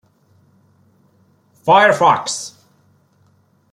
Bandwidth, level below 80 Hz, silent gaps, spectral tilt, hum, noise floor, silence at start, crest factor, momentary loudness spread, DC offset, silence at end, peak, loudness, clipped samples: 15 kHz; -66 dBFS; none; -3 dB/octave; none; -57 dBFS; 1.65 s; 18 dB; 15 LU; under 0.1%; 1.25 s; -2 dBFS; -14 LUFS; under 0.1%